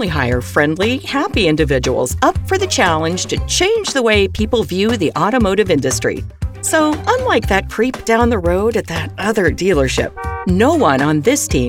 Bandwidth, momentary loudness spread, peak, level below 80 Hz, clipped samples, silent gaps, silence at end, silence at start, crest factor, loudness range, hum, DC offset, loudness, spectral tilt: 18 kHz; 5 LU; 0 dBFS; -30 dBFS; under 0.1%; none; 0 s; 0 s; 14 dB; 1 LU; none; under 0.1%; -15 LUFS; -4.5 dB/octave